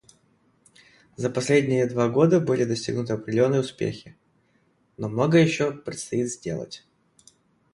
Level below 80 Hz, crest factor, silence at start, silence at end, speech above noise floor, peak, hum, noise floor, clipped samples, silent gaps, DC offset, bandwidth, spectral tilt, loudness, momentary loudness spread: -62 dBFS; 18 dB; 1.2 s; 0.95 s; 42 dB; -6 dBFS; none; -65 dBFS; under 0.1%; none; under 0.1%; 11.5 kHz; -6 dB/octave; -24 LUFS; 14 LU